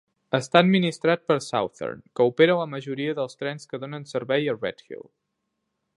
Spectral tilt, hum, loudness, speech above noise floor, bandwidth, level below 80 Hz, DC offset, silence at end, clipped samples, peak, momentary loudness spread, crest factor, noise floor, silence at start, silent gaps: -6 dB/octave; none; -24 LUFS; 55 dB; 11.5 kHz; -70 dBFS; under 0.1%; 1 s; under 0.1%; 0 dBFS; 15 LU; 24 dB; -79 dBFS; 0.3 s; none